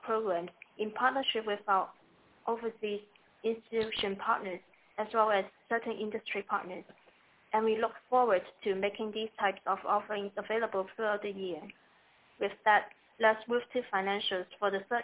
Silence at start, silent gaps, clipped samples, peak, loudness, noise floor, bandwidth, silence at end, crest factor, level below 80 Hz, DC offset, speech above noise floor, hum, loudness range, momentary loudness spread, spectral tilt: 0.05 s; none; under 0.1%; -14 dBFS; -33 LUFS; -65 dBFS; 4 kHz; 0 s; 20 dB; -74 dBFS; under 0.1%; 32 dB; none; 3 LU; 11 LU; -1 dB/octave